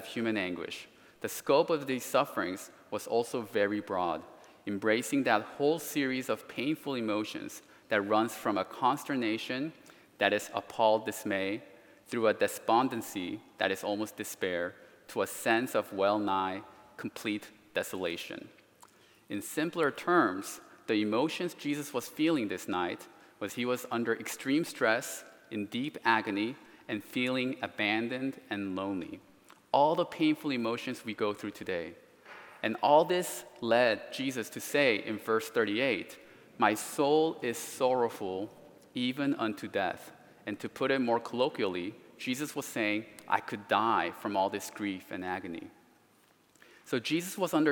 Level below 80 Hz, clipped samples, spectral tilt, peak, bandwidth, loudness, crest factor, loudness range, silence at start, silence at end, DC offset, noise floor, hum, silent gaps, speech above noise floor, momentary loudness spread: -80 dBFS; under 0.1%; -4 dB/octave; -10 dBFS; 18 kHz; -32 LUFS; 22 dB; 3 LU; 0 s; 0 s; under 0.1%; -66 dBFS; none; none; 34 dB; 13 LU